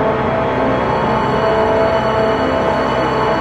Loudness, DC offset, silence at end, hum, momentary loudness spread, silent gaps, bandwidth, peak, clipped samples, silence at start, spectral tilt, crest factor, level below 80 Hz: -15 LUFS; under 0.1%; 0 s; none; 2 LU; none; 10.5 kHz; -2 dBFS; under 0.1%; 0 s; -6.5 dB/octave; 12 dB; -34 dBFS